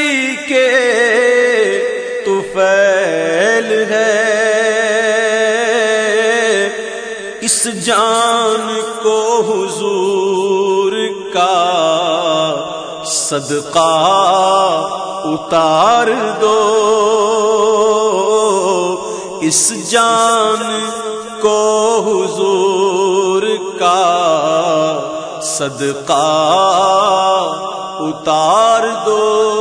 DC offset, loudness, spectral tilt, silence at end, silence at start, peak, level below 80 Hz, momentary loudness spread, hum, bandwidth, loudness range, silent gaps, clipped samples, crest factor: under 0.1%; -13 LUFS; -2.5 dB/octave; 0 s; 0 s; 0 dBFS; -58 dBFS; 8 LU; none; 10.5 kHz; 2 LU; none; under 0.1%; 12 dB